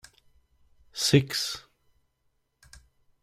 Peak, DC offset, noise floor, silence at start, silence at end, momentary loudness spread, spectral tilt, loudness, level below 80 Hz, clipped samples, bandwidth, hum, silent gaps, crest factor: -8 dBFS; under 0.1%; -74 dBFS; 0.95 s; 1.65 s; 17 LU; -4.5 dB/octave; -25 LUFS; -60 dBFS; under 0.1%; 16 kHz; none; none; 24 dB